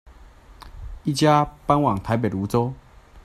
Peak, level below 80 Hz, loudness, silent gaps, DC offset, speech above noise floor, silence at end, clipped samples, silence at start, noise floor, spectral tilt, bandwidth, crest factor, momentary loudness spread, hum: -2 dBFS; -44 dBFS; -22 LUFS; none; under 0.1%; 26 dB; 0.05 s; under 0.1%; 0.25 s; -47 dBFS; -6.5 dB/octave; 14.5 kHz; 20 dB; 21 LU; none